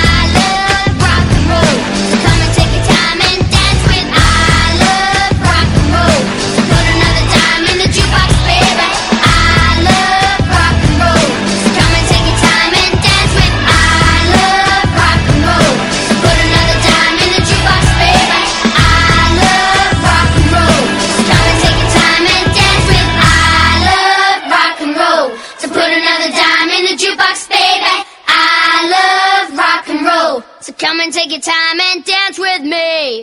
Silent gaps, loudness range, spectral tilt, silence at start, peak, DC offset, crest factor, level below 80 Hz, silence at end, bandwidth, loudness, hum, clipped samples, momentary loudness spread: none; 2 LU; -4 dB/octave; 0 s; 0 dBFS; under 0.1%; 10 dB; -20 dBFS; 0 s; 15.5 kHz; -9 LUFS; none; 0.4%; 5 LU